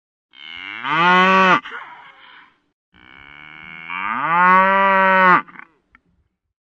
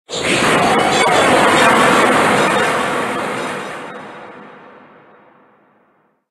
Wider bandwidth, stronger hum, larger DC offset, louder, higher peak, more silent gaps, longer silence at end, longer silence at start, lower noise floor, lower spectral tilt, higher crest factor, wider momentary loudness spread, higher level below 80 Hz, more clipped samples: second, 7.8 kHz vs 12.5 kHz; neither; neither; about the same, -14 LUFS vs -13 LUFS; about the same, 0 dBFS vs 0 dBFS; first, 2.73-2.92 s vs none; second, 1.35 s vs 1.8 s; first, 0.4 s vs 0.1 s; first, -66 dBFS vs -58 dBFS; first, -5.5 dB/octave vs -3 dB/octave; about the same, 18 dB vs 16 dB; first, 22 LU vs 18 LU; second, -66 dBFS vs -50 dBFS; neither